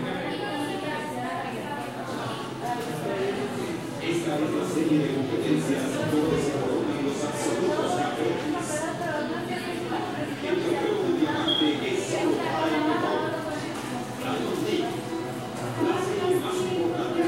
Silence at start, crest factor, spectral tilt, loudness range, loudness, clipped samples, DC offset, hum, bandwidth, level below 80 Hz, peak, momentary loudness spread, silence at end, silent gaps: 0 s; 16 dB; -5 dB/octave; 5 LU; -27 LUFS; under 0.1%; under 0.1%; none; 16 kHz; -60 dBFS; -12 dBFS; 7 LU; 0 s; none